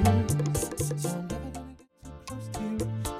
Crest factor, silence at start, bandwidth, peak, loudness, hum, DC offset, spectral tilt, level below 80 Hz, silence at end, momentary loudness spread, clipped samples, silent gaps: 20 dB; 0 s; 16 kHz; -10 dBFS; -31 LUFS; none; under 0.1%; -6 dB/octave; -42 dBFS; 0 s; 19 LU; under 0.1%; none